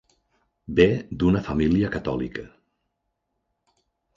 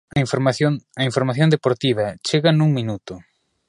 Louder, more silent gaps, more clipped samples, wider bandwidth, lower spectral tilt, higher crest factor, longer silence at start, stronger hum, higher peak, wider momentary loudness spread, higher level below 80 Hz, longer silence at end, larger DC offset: second, -23 LUFS vs -19 LUFS; neither; neither; second, 7.4 kHz vs 11 kHz; first, -8 dB/octave vs -6 dB/octave; about the same, 22 dB vs 18 dB; first, 0.7 s vs 0.15 s; neither; about the same, -4 dBFS vs -2 dBFS; about the same, 11 LU vs 11 LU; first, -42 dBFS vs -54 dBFS; first, 1.7 s vs 0.45 s; neither